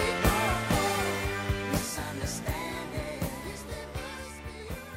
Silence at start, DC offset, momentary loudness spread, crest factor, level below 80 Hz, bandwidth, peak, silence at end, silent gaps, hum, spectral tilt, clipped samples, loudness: 0 s; under 0.1%; 13 LU; 20 dB; -40 dBFS; 16 kHz; -10 dBFS; 0 s; none; none; -4 dB/octave; under 0.1%; -31 LUFS